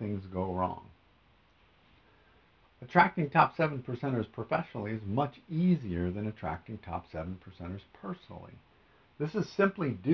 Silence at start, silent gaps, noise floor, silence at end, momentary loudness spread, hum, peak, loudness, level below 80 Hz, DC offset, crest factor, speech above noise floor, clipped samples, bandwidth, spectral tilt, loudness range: 0 s; none; -65 dBFS; 0 s; 17 LU; none; -8 dBFS; -32 LUFS; -54 dBFS; under 0.1%; 24 dB; 33 dB; under 0.1%; 6.2 kHz; -6 dB/octave; 9 LU